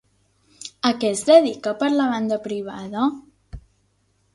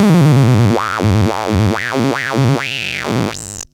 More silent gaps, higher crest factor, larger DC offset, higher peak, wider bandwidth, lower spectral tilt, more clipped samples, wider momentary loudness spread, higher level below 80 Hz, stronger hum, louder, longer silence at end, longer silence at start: neither; first, 22 dB vs 14 dB; neither; about the same, -2 dBFS vs 0 dBFS; second, 11.5 kHz vs 17 kHz; second, -4 dB/octave vs -6 dB/octave; neither; first, 17 LU vs 8 LU; second, -52 dBFS vs -38 dBFS; neither; second, -20 LUFS vs -14 LUFS; first, 0.75 s vs 0.1 s; first, 0.6 s vs 0 s